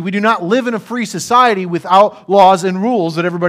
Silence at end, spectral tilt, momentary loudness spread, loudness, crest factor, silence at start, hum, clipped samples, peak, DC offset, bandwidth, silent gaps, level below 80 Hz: 0 s; -5 dB/octave; 10 LU; -13 LUFS; 12 dB; 0 s; none; 0.1%; 0 dBFS; under 0.1%; 16 kHz; none; -62 dBFS